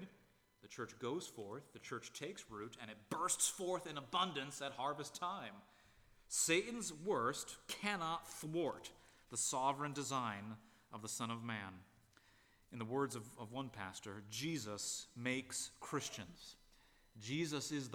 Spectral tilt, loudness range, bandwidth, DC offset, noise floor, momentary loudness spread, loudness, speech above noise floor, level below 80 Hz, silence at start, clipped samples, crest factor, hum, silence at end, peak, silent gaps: -3 dB/octave; 6 LU; over 20 kHz; under 0.1%; -72 dBFS; 16 LU; -43 LUFS; 28 dB; -76 dBFS; 0 s; under 0.1%; 24 dB; none; 0 s; -20 dBFS; none